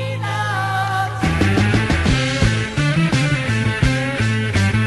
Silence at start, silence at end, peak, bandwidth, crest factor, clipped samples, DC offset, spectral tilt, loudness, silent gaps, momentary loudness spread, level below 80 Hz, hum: 0 s; 0 s; -4 dBFS; 12 kHz; 14 dB; under 0.1%; under 0.1%; -5.5 dB/octave; -18 LUFS; none; 4 LU; -30 dBFS; none